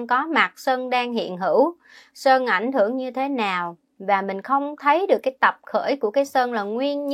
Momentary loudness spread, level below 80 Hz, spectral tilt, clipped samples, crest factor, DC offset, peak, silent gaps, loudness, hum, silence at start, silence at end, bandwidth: 7 LU; -78 dBFS; -4.5 dB/octave; under 0.1%; 20 dB; under 0.1%; -2 dBFS; none; -22 LUFS; none; 0 s; 0 s; 15.5 kHz